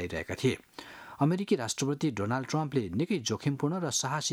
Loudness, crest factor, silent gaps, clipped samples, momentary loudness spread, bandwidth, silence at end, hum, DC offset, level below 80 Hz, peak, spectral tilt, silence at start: -31 LUFS; 18 dB; none; under 0.1%; 7 LU; 16 kHz; 0 s; none; under 0.1%; -62 dBFS; -12 dBFS; -4.5 dB/octave; 0 s